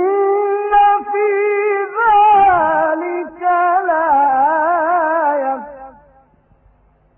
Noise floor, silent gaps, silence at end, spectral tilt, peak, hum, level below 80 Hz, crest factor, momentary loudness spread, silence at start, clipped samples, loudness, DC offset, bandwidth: -53 dBFS; none; 1.25 s; -9.5 dB/octave; -2 dBFS; none; -52 dBFS; 12 dB; 9 LU; 0 s; under 0.1%; -14 LUFS; under 0.1%; 3.4 kHz